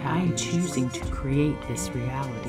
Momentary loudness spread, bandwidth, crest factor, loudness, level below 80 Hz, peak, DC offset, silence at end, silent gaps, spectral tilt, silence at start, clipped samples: 5 LU; 15.5 kHz; 14 dB; -27 LUFS; -40 dBFS; -12 dBFS; under 0.1%; 0 s; none; -5.5 dB/octave; 0 s; under 0.1%